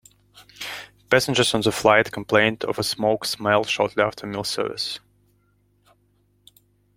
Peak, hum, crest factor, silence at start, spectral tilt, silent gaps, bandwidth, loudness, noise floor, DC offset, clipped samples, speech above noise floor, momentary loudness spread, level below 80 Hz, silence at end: -2 dBFS; 50 Hz at -50 dBFS; 22 dB; 0.35 s; -3.5 dB/octave; none; 16.5 kHz; -21 LUFS; -64 dBFS; under 0.1%; under 0.1%; 42 dB; 15 LU; -58 dBFS; 2 s